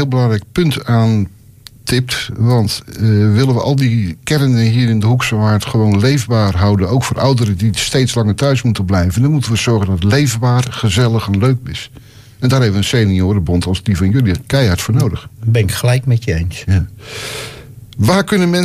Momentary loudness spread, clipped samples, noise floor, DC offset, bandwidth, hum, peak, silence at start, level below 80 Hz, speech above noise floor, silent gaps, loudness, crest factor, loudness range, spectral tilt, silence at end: 7 LU; under 0.1%; -40 dBFS; under 0.1%; 15.5 kHz; none; -2 dBFS; 0 s; -34 dBFS; 27 dB; none; -14 LUFS; 12 dB; 2 LU; -6 dB/octave; 0 s